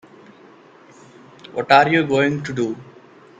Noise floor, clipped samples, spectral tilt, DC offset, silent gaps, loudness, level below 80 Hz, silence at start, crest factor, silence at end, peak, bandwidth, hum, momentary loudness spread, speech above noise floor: -47 dBFS; under 0.1%; -6 dB/octave; under 0.1%; none; -17 LUFS; -62 dBFS; 1.55 s; 22 dB; 0.55 s; 0 dBFS; 9.4 kHz; none; 16 LU; 30 dB